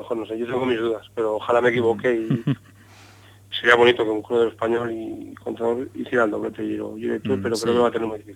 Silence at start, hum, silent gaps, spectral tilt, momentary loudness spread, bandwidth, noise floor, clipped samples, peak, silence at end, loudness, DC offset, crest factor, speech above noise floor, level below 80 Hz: 0 s; none; none; -5.5 dB/octave; 11 LU; 14 kHz; -48 dBFS; under 0.1%; 0 dBFS; 0 s; -22 LUFS; under 0.1%; 22 dB; 26 dB; -62 dBFS